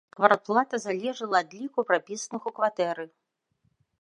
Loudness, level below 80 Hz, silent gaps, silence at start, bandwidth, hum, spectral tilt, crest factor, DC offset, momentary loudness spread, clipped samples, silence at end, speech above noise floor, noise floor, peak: -27 LUFS; -82 dBFS; none; 0.2 s; 11 kHz; none; -3.5 dB/octave; 24 dB; under 0.1%; 12 LU; under 0.1%; 0.95 s; 47 dB; -73 dBFS; -4 dBFS